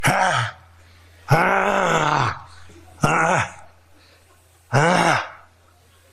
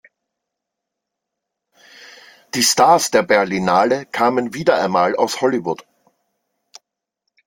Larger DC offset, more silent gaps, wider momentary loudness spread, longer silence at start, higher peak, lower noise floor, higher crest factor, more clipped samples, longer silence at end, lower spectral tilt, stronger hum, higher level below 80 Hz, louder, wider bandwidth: neither; neither; about the same, 10 LU vs 8 LU; second, 0 s vs 2 s; second, -4 dBFS vs 0 dBFS; second, -54 dBFS vs -81 dBFS; about the same, 18 dB vs 20 dB; neither; second, 0.75 s vs 1.65 s; first, -4.5 dB/octave vs -3 dB/octave; neither; first, -50 dBFS vs -62 dBFS; second, -19 LUFS vs -16 LUFS; second, 14 kHz vs 17 kHz